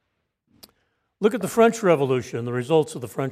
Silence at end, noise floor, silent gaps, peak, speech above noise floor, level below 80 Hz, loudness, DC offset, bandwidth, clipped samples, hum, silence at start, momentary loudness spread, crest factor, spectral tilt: 0 s; -75 dBFS; none; -4 dBFS; 54 dB; -66 dBFS; -22 LUFS; under 0.1%; 15.5 kHz; under 0.1%; none; 1.2 s; 10 LU; 20 dB; -6 dB/octave